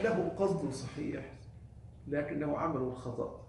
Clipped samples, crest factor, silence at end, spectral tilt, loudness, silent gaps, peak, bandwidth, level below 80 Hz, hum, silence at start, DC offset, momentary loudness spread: under 0.1%; 16 dB; 0 s; -7 dB/octave; -36 LUFS; none; -20 dBFS; 11.5 kHz; -58 dBFS; none; 0 s; under 0.1%; 20 LU